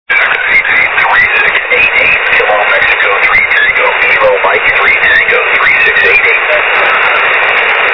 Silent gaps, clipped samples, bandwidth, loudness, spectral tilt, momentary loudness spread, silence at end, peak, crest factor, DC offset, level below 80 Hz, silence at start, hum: none; 0.9%; 5.4 kHz; -6 LUFS; -4 dB/octave; 2 LU; 0 s; 0 dBFS; 8 dB; 0.3%; -40 dBFS; 0.1 s; none